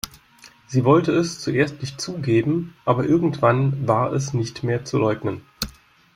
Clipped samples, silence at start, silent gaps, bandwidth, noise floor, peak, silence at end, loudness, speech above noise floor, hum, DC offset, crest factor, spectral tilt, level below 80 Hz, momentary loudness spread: under 0.1%; 0.05 s; none; 16.5 kHz; -50 dBFS; -2 dBFS; 0.45 s; -21 LUFS; 30 dB; none; under 0.1%; 18 dB; -6.5 dB/octave; -52 dBFS; 12 LU